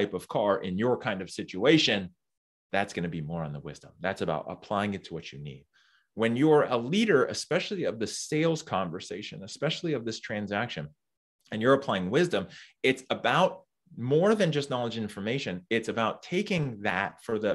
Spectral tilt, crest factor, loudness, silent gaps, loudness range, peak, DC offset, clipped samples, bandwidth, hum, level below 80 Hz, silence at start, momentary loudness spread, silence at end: -5 dB/octave; 22 dB; -28 LUFS; 2.37-2.70 s, 11.17-11.39 s; 6 LU; -6 dBFS; under 0.1%; under 0.1%; 12.5 kHz; none; -66 dBFS; 0 s; 14 LU; 0 s